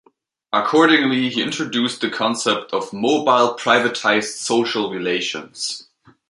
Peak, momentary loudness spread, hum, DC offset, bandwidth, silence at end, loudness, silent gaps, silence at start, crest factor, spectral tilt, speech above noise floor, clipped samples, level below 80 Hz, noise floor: -2 dBFS; 11 LU; none; under 0.1%; 11.5 kHz; 0.45 s; -19 LUFS; none; 0.5 s; 18 dB; -3 dB/octave; 38 dB; under 0.1%; -68 dBFS; -57 dBFS